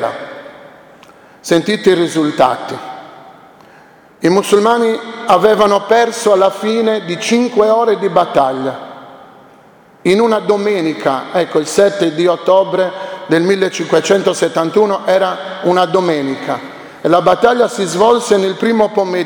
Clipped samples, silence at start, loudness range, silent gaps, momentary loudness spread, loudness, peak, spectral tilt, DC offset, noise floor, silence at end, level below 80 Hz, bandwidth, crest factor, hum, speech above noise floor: under 0.1%; 0 s; 4 LU; none; 10 LU; -13 LUFS; 0 dBFS; -4.5 dB/octave; under 0.1%; -44 dBFS; 0 s; -56 dBFS; 19.5 kHz; 14 dB; none; 31 dB